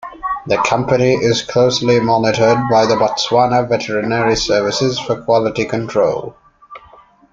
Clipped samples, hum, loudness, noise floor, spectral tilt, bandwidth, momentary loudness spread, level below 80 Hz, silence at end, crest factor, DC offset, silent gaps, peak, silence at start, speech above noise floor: under 0.1%; none; -15 LUFS; -45 dBFS; -5 dB/octave; 7.8 kHz; 5 LU; -44 dBFS; 0.55 s; 16 dB; under 0.1%; none; 0 dBFS; 0 s; 31 dB